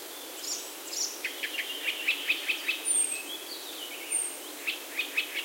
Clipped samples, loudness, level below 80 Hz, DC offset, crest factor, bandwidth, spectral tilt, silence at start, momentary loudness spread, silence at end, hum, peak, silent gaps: under 0.1%; -30 LUFS; -86 dBFS; under 0.1%; 20 dB; 16.5 kHz; 2.5 dB/octave; 0 s; 11 LU; 0 s; none; -14 dBFS; none